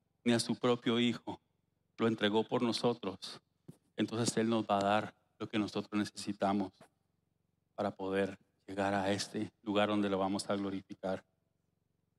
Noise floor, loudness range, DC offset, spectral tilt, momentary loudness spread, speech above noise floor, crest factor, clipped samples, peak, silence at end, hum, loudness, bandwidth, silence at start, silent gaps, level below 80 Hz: -80 dBFS; 4 LU; under 0.1%; -5 dB/octave; 14 LU; 46 dB; 18 dB; under 0.1%; -16 dBFS; 1 s; none; -35 LUFS; 13 kHz; 0.25 s; none; -82 dBFS